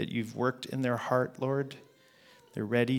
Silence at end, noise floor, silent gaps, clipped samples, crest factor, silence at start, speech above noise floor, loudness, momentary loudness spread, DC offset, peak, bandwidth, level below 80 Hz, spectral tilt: 0 s; -60 dBFS; none; under 0.1%; 20 dB; 0 s; 29 dB; -32 LUFS; 11 LU; under 0.1%; -12 dBFS; 17 kHz; -74 dBFS; -7 dB/octave